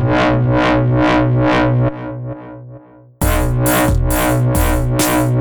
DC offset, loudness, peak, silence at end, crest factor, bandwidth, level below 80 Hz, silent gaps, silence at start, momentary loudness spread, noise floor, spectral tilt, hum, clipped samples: under 0.1%; -14 LUFS; -2 dBFS; 0 s; 12 dB; over 20 kHz; -24 dBFS; none; 0 s; 13 LU; -39 dBFS; -6 dB/octave; none; under 0.1%